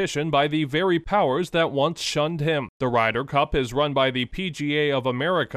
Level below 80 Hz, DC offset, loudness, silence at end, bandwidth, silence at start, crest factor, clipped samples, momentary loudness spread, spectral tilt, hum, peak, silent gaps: -44 dBFS; under 0.1%; -23 LUFS; 0 s; 14 kHz; 0 s; 16 dB; under 0.1%; 3 LU; -5 dB/octave; none; -8 dBFS; 2.69-2.80 s